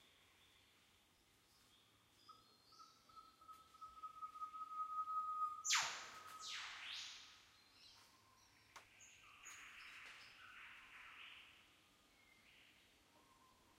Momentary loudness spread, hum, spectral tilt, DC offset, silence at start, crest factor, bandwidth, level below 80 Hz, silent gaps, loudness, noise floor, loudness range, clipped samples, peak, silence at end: 24 LU; none; 2 dB/octave; under 0.1%; 0 s; 28 dB; 16 kHz; -86 dBFS; none; -48 LUFS; -75 dBFS; 19 LU; under 0.1%; -26 dBFS; 0 s